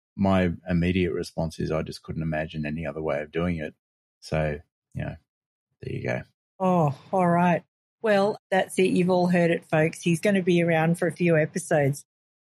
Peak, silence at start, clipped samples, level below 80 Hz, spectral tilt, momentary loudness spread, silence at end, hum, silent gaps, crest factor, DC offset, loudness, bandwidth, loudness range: -8 dBFS; 0.15 s; under 0.1%; -50 dBFS; -6.5 dB/octave; 12 LU; 0.4 s; none; 3.79-4.21 s, 4.72-4.82 s, 5.29-5.67 s, 6.34-6.59 s, 7.68-7.98 s, 8.39-8.50 s; 16 dB; under 0.1%; -25 LUFS; 12.5 kHz; 9 LU